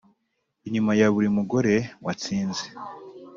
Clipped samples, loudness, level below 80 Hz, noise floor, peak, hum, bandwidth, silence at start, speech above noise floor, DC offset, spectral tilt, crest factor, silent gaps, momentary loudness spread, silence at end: under 0.1%; -24 LUFS; -62 dBFS; -76 dBFS; -8 dBFS; none; 7.4 kHz; 0.65 s; 52 dB; under 0.1%; -5.5 dB/octave; 18 dB; none; 19 LU; 0 s